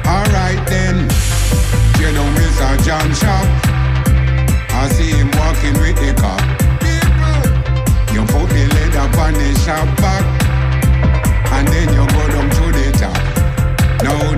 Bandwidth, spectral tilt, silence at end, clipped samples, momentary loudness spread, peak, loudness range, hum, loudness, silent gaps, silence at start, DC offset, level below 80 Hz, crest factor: 16 kHz; -5.5 dB/octave; 0 s; under 0.1%; 2 LU; -4 dBFS; 0 LU; none; -14 LUFS; none; 0 s; under 0.1%; -16 dBFS; 8 dB